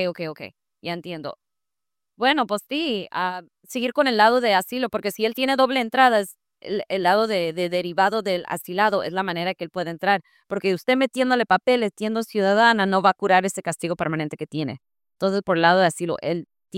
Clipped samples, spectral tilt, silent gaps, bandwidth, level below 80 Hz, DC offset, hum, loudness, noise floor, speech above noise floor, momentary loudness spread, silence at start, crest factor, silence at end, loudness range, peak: under 0.1%; -4.5 dB/octave; none; 16.5 kHz; -68 dBFS; under 0.1%; none; -22 LUFS; -89 dBFS; 67 dB; 14 LU; 0 s; 20 dB; 0 s; 4 LU; -4 dBFS